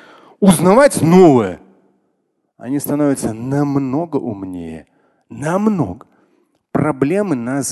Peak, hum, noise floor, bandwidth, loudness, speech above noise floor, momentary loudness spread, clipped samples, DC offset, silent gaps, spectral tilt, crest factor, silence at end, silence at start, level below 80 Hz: 0 dBFS; none; -67 dBFS; 12.5 kHz; -15 LUFS; 53 dB; 18 LU; under 0.1%; under 0.1%; none; -6.5 dB/octave; 16 dB; 0 s; 0.4 s; -48 dBFS